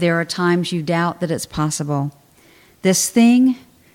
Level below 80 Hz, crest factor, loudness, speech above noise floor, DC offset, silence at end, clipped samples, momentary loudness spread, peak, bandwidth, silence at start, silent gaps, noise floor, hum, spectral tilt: -52 dBFS; 16 dB; -18 LUFS; 33 dB; under 0.1%; 0.35 s; under 0.1%; 10 LU; -2 dBFS; 16.5 kHz; 0 s; none; -50 dBFS; none; -4.5 dB/octave